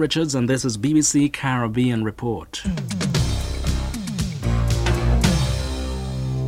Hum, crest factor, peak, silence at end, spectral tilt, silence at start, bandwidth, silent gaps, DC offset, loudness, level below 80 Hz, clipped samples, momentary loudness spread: none; 16 dB; -4 dBFS; 0 s; -5 dB/octave; 0 s; 16 kHz; none; under 0.1%; -22 LUFS; -28 dBFS; under 0.1%; 9 LU